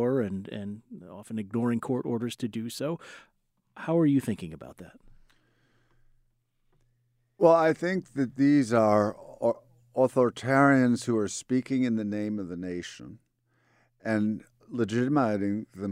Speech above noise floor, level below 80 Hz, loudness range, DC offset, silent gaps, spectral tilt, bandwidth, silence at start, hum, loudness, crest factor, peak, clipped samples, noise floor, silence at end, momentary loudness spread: 45 dB; -66 dBFS; 8 LU; under 0.1%; none; -6.5 dB/octave; 14.5 kHz; 0 s; none; -27 LUFS; 22 dB; -8 dBFS; under 0.1%; -71 dBFS; 0 s; 17 LU